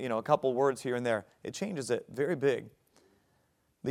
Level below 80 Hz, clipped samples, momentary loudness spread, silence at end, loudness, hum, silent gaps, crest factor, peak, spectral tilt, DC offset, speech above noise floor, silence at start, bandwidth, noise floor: -76 dBFS; under 0.1%; 9 LU; 0 s; -32 LUFS; none; none; 22 dB; -10 dBFS; -5.5 dB/octave; under 0.1%; 41 dB; 0 s; 15 kHz; -73 dBFS